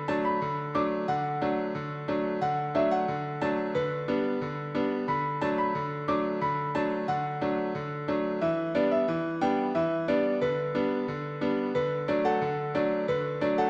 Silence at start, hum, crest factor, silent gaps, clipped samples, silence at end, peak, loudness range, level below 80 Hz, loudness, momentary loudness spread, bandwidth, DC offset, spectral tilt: 0 s; none; 16 dB; none; under 0.1%; 0 s; -14 dBFS; 2 LU; -62 dBFS; -29 LUFS; 4 LU; 7.8 kHz; under 0.1%; -8 dB/octave